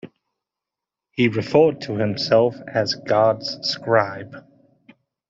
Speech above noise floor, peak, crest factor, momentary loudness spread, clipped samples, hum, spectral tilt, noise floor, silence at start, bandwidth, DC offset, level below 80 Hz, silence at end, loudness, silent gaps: 67 dB; -2 dBFS; 20 dB; 9 LU; under 0.1%; none; -6 dB/octave; -87 dBFS; 0.05 s; 7.6 kHz; under 0.1%; -62 dBFS; 0.9 s; -20 LUFS; none